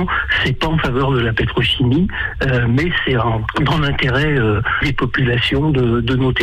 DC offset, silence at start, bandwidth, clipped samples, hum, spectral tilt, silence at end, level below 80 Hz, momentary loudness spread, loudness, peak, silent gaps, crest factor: under 0.1%; 0 s; 9.4 kHz; under 0.1%; none; -7 dB/octave; 0 s; -28 dBFS; 2 LU; -16 LUFS; -6 dBFS; none; 10 dB